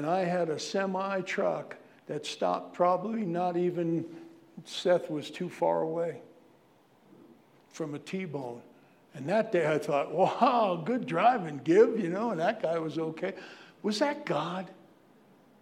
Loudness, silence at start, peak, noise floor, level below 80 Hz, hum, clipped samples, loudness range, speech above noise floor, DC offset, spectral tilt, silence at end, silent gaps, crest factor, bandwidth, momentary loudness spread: -30 LUFS; 0 s; -10 dBFS; -62 dBFS; -86 dBFS; none; under 0.1%; 9 LU; 33 dB; under 0.1%; -6 dB/octave; 0.9 s; none; 20 dB; 13.5 kHz; 16 LU